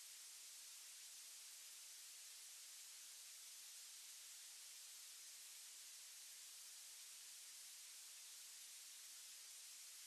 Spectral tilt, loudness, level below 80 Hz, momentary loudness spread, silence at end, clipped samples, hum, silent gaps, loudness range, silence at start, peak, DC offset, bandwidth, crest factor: 5.5 dB/octave; -56 LUFS; under -90 dBFS; 0 LU; 0 s; under 0.1%; none; none; 0 LU; 0 s; -46 dBFS; under 0.1%; 13 kHz; 14 dB